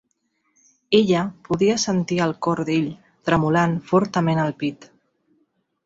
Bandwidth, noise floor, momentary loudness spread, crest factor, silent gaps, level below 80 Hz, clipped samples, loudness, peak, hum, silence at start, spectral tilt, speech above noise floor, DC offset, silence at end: 7.8 kHz; -70 dBFS; 8 LU; 20 dB; none; -56 dBFS; under 0.1%; -21 LUFS; -2 dBFS; none; 0.9 s; -5.5 dB/octave; 50 dB; under 0.1%; 1 s